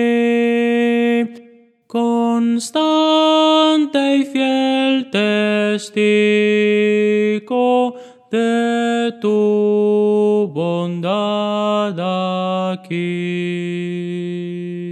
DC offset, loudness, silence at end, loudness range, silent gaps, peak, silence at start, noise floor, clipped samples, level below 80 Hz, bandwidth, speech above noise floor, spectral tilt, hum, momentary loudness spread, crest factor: under 0.1%; -17 LUFS; 0 s; 5 LU; none; -4 dBFS; 0 s; -47 dBFS; under 0.1%; -76 dBFS; 12 kHz; 31 dB; -5.5 dB/octave; none; 9 LU; 14 dB